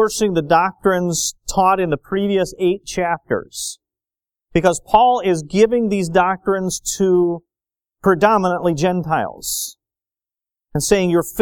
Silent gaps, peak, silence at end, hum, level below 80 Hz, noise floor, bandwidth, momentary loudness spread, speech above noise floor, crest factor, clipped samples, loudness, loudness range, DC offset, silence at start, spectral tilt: none; 0 dBFS; 0 s; none; -44 dBFS; under -90 dBFS; 19 kHz; 8 LU; over 73 dB; 18 dB; under 0.1%; -18 LUFS; 3 LU; under 0.1%; 0 s; -4.5 dB/octave